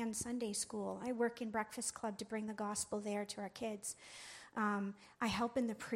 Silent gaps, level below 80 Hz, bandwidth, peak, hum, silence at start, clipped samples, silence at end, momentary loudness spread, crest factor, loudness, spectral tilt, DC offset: none; -72 dBFS; 16 kHz; -24 dBFS; none; 0 s; under 0.1%; 0 s; 8 LU; 18 dB; -41 LUFS; -3.5 dB/octave; under 0.1%